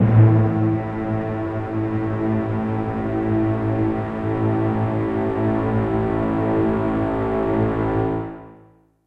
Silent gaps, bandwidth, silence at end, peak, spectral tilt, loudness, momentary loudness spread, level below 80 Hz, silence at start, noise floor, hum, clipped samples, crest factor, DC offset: none; 4.1 kHz; 0.5 s; -4 dBFS; -10.5 dB/octave; -21 LUFS; 5 LU; -40 dBFS; 0 s; -52 dBFS; none; under 0.1%; 16 dB; under 0.1%